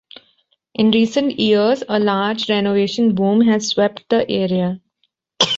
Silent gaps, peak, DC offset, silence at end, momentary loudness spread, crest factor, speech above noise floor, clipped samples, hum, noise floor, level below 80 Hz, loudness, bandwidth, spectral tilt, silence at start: none; 0 dBFS; under 0.1%; 0 s; 5 LU; 16 dB; 52 dB; under 0.1%; none; -68 dBFS; -58 dBFS; -17 LUFS; 7.8 kHz; -5 dB/octave; 0.8 s